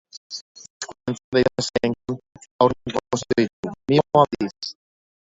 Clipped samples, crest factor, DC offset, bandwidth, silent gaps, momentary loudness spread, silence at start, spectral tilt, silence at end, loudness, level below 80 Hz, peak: under 0.1%; 22 dB; under 0.1%; 8 kHz; 0.17-0.30 s, 0.41-0.55 s, 0.70-0.80 s, 1.24-1.32 s, 2.51-2.59 s, 3.53-3.63 s; 17 LU; 0.15 s; -5.5 dB/octave; 0.65 s; -22 LUFS; -54 dBFS; -2 dBFS